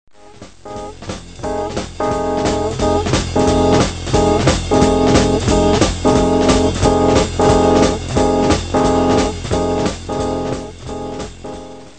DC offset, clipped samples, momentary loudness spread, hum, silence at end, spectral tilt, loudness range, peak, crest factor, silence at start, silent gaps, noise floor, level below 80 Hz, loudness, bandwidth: 1%; under 0.1%; 16 LU; none; 0.1 s; -5.5 dB/octave; 5 LU; 0 dBFS; 16 dB; 0.4 s; none; -40 dBFS; -28 dBFS; -15 LUFS; 9.4 kHz